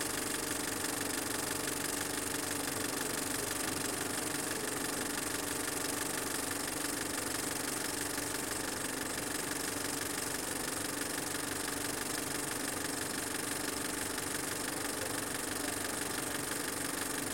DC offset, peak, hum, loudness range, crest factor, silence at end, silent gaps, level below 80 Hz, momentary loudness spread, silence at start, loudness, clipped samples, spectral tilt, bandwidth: under 0.1%; -20 dBFS; none; 1 LU; 18 dB; 0 s; none; -60 dBFS; 1 LU; 0 s; -35 LUFS; under 0.1%; -2 dB/octave; 17 kHz